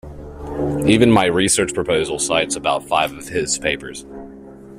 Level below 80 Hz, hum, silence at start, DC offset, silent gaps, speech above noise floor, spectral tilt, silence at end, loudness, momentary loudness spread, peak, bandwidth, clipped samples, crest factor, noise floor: -42 dBFS; none; 0.05 s; under 0.1%; none; 20 dB; -4 dB/octave; 0 s; -18 LUFS; 20 LU; -2 dBFS; 15 kHz; under 0.1%; 18 dB; -38 dBFS